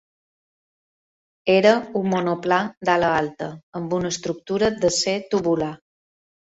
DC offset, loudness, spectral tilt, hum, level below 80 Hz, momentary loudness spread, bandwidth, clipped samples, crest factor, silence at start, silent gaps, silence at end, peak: under 0.1%; -21 LUFS; -4.5 dB/octave; none; -56 dBFS; 11 LU; 8.4 kHz; under 0.1%; 20 dB; 1.45 s; 2.77-2.81 s, 3.63-3.72 s; 0.7 s; -2 dBFS